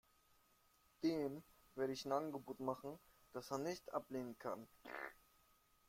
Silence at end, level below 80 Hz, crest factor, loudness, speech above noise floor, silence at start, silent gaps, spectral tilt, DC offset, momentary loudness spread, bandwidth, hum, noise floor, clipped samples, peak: 0.75 s; -80 dBFS; 20 dB; -46 LUFS; 30 dB; 1 s; none; -5.5 dB/octave; under 0.1%; 13 LU; 16.5 kHz; none; -75 dBFS; under 0.1%; -26 dBFS